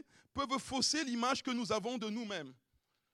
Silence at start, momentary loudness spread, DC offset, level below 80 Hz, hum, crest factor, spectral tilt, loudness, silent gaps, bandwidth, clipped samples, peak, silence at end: 0.35 s; 11 LU; under 0.1%; -70 dBFS; none; 18 dB; -2.5 dB/octave; -36 LUFS; none; 13 kHz; under 0.1%; -20 dBFS; 0.6 s